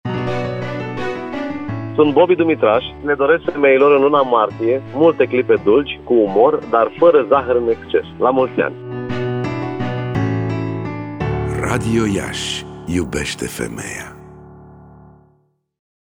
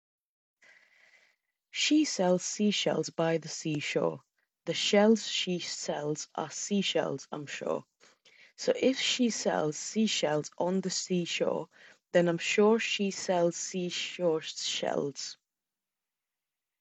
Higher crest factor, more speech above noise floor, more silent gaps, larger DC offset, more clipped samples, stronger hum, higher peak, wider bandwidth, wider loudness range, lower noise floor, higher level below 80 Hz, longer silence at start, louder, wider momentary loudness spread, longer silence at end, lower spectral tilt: about the same, 16 dB vs 20 dB; second, 45 dB vs over 60 dB; neither; neither; neither; neither; first, -2 dBFS vs -10 dBFS; first, 16 kHz vs 8.4 kHz; first, 8 LU vs 4 LU; second, -60 dBFS vs under -90 dBFS; first, -42 dBFS vs -82 dBFS; second, 0.05 s vs 1.75 s; first, -17 LUFS vs -30 LUFS; about the same, 12 LU vs 10 LU; about the same, 1.35 s vs 1.45 s; first, -6 dB/octave vs -3.5 dB/octave